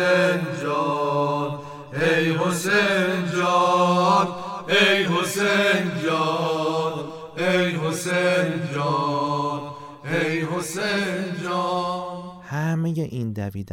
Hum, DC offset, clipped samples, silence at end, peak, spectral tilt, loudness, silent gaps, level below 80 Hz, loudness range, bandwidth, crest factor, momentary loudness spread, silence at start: none; under 0.1%; under 0.1%; 0 s; -6 dBFS; -5 dB/octave; -22 LUFS; none; -64 dBFS; 6 LU; 16.5 kHz; 16 dB; 11 LU; 0 s